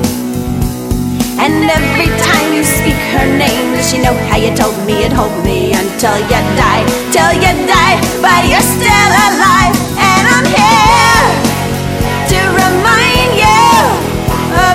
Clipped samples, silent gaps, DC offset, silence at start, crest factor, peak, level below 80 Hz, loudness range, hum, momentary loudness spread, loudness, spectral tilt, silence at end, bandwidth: 0.5%; none; under 0.1%; 0 s; 10 dB; 0 dBFS; -24 dBFS; 4 LU; none; 8 LU; -9 LUFS; -4 dB/octave; 0 s; 18 kHz